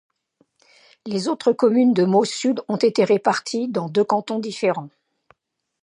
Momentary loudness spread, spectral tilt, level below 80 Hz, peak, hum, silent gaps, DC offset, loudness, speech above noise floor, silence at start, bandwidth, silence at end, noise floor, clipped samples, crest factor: 9 LU; -5.5 dB/octave; -74 dBFS; -4 dBFS; none; none; under 0.1%; -20 LUFS; 56 dB; 1.05 s; 10.5 kHz; 0.95 s; -75 dBFS; under 0.1%; 18 dB